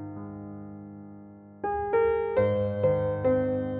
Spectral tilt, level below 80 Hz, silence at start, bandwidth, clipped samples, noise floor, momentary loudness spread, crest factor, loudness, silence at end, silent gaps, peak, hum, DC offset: -11.5 dB/octave; -52 dBFS; 0 s; 3.9 kHz; under 0.1%; -47 dBFS; 19 LU; 16 dB; -26 LUFS; 0 s; none; -12 dBFS; 50 Hz at -50 dBFS; under 0.1%